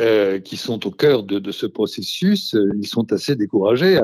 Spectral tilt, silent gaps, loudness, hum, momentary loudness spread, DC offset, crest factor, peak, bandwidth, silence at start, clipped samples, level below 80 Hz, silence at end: -6 dB/octave; none; -19 LUFS; none; 8 LU; under 0.1%; 14 dB; -4 dBFS; 14 kHz; 0 s; under 0.1%; -62 dBFS; 0 s